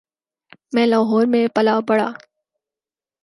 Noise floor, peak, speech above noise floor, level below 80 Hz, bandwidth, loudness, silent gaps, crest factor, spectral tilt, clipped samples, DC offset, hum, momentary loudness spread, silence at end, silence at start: under -90 dBFS; -4 dBFS; over 73 dB; -72 dBFS; 11.5 kHz; -18 LUFS; none; 16 dB; -6.5 dB/octave; under 0.1%; under 0.1%; none; 5 LU; 1.05 s; 0.7 s